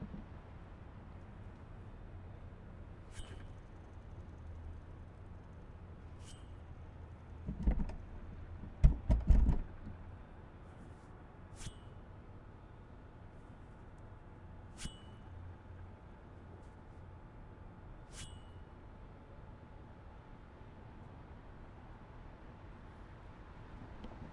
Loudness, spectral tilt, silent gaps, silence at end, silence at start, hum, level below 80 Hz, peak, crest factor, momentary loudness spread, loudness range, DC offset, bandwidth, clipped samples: -46 LUFS; -7 dB/octave; none; 0 s; 0 s; none; -44 dBFS; -12 dBFS; 30 dB; 17 LU; 18 LU; under 0.1%; 11 kHz; under 0.1%